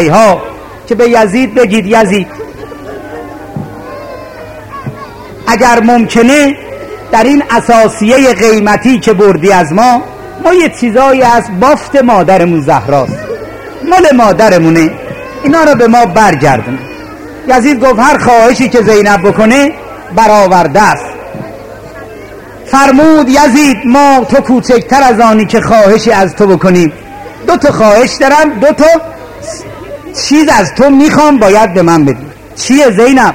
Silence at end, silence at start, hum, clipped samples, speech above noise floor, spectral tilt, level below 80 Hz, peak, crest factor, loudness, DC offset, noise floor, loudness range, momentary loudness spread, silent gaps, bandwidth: 0 s; 0 s; none; 2%; 21 dB; -5 dB/octave; -34 dBFS; 0 dBFS; 6 dB; -6 LUFS; under 0.1%; -27 dBFS; 4 LU; 19 LU; none; 16.5 kHz